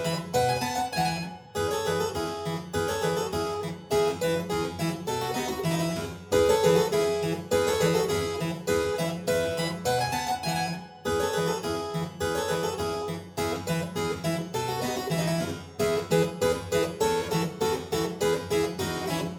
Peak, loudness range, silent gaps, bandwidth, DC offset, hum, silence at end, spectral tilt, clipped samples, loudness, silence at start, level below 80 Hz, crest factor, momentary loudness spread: -8 dBFS; 4 LU; none; 19 kHz; under 0.1%; none; 0 s; -4.5 dB/octave; under 0.1%; -28 LUFS; 0 s; -52 dBFS; 20 dB; 6 LU